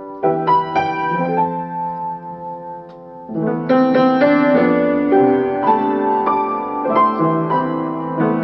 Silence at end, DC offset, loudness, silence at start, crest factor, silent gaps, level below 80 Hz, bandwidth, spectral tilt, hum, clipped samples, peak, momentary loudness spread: 0 s; under 0.1%; -17 LUFS; 0 s; 14 dB; none; -56 dBFS; 6 kHz; -9 dB/octave; none; under 0.1%; -2 dBFS; 15 LU